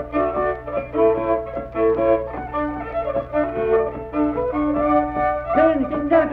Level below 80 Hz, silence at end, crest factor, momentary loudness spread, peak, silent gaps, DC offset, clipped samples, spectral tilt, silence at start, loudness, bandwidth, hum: -40 dBFS; 0 s; 16 dB; 7 LU; -6 dBFS; none; under 0.1%; under 0.1%; -9.5 dB/octave; 0 s; -21 LUFS; 4.7 kHz; none